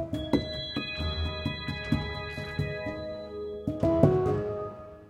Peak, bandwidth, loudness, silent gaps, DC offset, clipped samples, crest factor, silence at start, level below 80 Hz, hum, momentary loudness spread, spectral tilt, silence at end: -4 dBFS; 12.5 kHz; -30 LUFS; none; under 0.1%; under 0.1%; 26 dB; 0 s; -46 dBFS; none; 13 LU; -7.5 dB/octave; 0 s